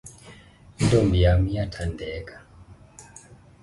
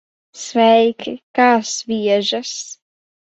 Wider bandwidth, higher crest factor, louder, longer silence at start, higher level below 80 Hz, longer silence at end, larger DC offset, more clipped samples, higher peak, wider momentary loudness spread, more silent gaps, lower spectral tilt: first, 11.5 kHz vs 8.2 kHz; about the same, 18 dB vs 16 dB; second, -23 LUFS vs -16 LUFS; second, 0.05 s vs 0.35 s; first, -34 dBFS vs -66 dBFS; about the same, 0.6 s vs 0.55 s; neither; neither; second, -6 dBFS vs -2 dBFS; first, 25 LU vs 16 LU; second, none vs 1.23-1.34 s; first, -6.5 dB/octave vs -3 dB/octave